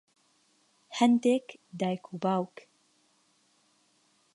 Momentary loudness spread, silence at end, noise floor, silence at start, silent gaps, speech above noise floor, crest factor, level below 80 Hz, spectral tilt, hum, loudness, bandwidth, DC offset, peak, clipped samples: 17 LU; 1.9 s; -69 dBFS; 0.9 s; none; 41 dB; 22 dB; -82 dBFS; -6 dB/octave; none; -29 LUFS; 11.5 kHz; under 0.1%; -10 dBFS; under 0.1%